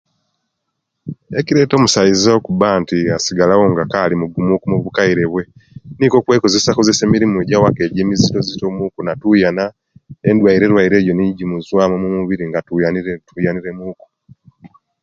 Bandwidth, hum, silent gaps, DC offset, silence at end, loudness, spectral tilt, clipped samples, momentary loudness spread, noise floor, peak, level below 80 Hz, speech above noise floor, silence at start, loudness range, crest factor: 9 kHz; none; none; under 0.1%; 0.35 s; -14 LUFS; -5.5 dB/octave; under 0.1%; 11 LU; -74 dBFS; 0 dBFS; -44 dBFS; 60 dB; 1.05 s; 3 LU; 14 dB